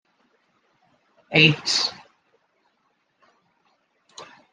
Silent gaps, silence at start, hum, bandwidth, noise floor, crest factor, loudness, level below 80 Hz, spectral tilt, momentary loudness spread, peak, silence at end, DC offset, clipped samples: none; 1.3 s; none; 10 kHz; -70 dBFS; 26 dB; -19 LUFS; -68 dBFS; -3.5 dB/octave; 28 LU; -2 dBFS; 0.3 s; under 0.1%; under 0.1%